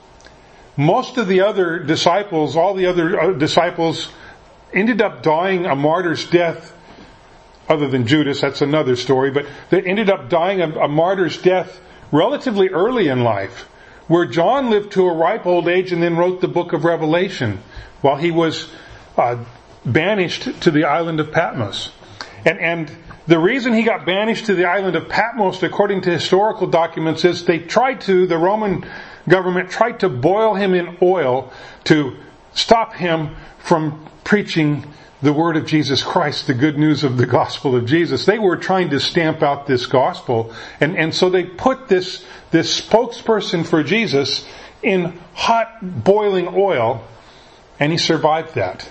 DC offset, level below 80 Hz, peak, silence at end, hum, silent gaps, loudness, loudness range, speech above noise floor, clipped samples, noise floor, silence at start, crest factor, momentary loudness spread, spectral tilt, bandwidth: under 0.1%; -50 dBFS; 0 dBFS; 0 s; none; none; -17 LUFS; 2 LU; 28 dB; under 0.1%; -45 dBFS; 0.75 s; 18 dB; 8 LU; -5.5 dB/octave; 8.6 kHz